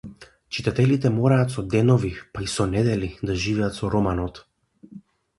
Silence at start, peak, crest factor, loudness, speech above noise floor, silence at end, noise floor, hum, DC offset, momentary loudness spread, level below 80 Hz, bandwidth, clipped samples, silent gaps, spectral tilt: 0.05 s; -4 dBFS; 18 dB; -23 LUFS; 25 dB; 0.4 s; -47 dBFS; none; under 0.1%; 11 LU; -42 dBFS; 11.5 kHz; under 0.1%; none; -6.5 dB/octave